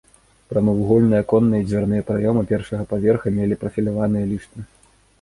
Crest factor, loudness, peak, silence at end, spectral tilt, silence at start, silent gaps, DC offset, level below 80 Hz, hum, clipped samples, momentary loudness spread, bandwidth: 16 dB; -20 LUFS; -4 dBFS; 0.6 s; -9.5 dB/octave; 0.5 s; none; under 0.1%; -44 dBFS; none; under 0.1%; 9 LU; 11.5 kHz